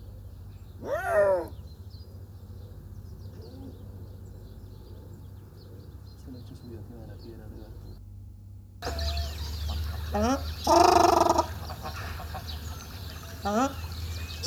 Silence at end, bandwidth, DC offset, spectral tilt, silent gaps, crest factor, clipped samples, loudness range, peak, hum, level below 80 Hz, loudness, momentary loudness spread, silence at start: 0 s; 17.5 kHz; under 0.1%; -5 dB/octave; none; 24 dB; under 0.1%; 20 LU; -6 dBFS; none; -42 dBFS; -28 LUFS; 23 LU; 0 s